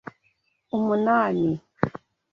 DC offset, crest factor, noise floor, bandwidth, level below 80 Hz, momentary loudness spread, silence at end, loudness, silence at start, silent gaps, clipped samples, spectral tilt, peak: under 0.1%; 24 dB; -69 dBFS; 6.6 kHz; -60 dBFS; 16 LU; 0.35 s; -24 LUFS; 0.75 s; none; under 0.1%; -9 dB/octave; -2 dBFS